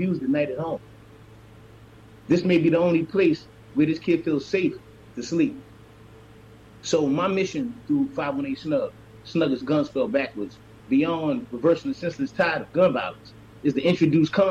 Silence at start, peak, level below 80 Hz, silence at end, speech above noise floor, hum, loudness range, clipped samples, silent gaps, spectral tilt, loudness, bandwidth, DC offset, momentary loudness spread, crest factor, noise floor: 0 s; -10 dBFS; -58 dBFS; 0 s; 25 dB; none; 4 LU; under 0.1%; none; -6.5 dB/octave; -24 LUFS; 8.2 kHz; under 0.1%; 12 LU; 14 dB; -48 dBFS